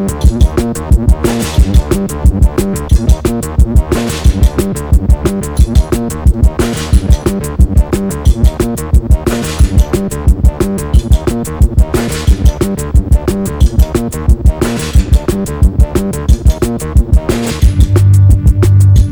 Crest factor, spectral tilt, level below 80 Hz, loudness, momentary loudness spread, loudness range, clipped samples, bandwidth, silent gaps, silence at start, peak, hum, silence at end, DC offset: 10 dB; -6.5 dB/octave; -12 dBFS; -12 LUFS; 6 LU; 1 LU; 3%; 20 kHz; none; 0 s; 0 dBFS; none; 0 s; under 0.1%